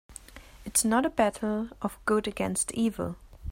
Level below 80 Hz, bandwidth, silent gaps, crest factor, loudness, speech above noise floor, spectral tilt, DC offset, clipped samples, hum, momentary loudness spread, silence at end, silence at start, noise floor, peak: -50 dBFS; 16 kHz; none; 20 dB; -28 LUFS; 21 dB; -4 dB/octave; under 0.1%; under 0.1%; none; 18 LU; 0 s; 0.1 s; -49 dBFS; -10 dBFS